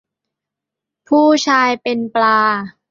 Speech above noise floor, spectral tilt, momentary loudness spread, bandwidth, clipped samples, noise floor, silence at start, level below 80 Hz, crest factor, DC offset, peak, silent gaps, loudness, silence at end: 69 dB; -3.5 dB/octave; 7 LU; 7.6 kHz; under 0.1%; -83 dBFS; 1.1 s; -64 dBFS; 14 dB; under 0.1%; -2 dBFS; none; -14 LUFS; 0.2 s